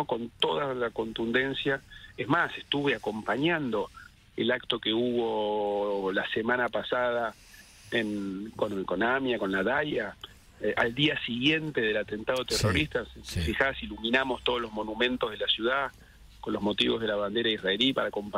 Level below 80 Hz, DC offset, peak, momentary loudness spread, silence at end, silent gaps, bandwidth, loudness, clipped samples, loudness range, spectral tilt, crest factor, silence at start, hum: -52 dBFS; under 0.1%; -10 dBFS; 8 LU; 0 s; none; 16 kHz; -29 LUFS; under 0.1%; 2 LU; -4.5 dB/octave; 20 dB; 0 s; none